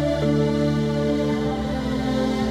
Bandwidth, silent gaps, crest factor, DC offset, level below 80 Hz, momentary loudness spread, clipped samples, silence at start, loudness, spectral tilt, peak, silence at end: 12.5 kHz; none; 12 dB; under 0.1%; -36 dBFS; 4 LU; under 0.1%; 0 s; -22 LUFS; -7 dB/octave; -10 dBFS; 0 s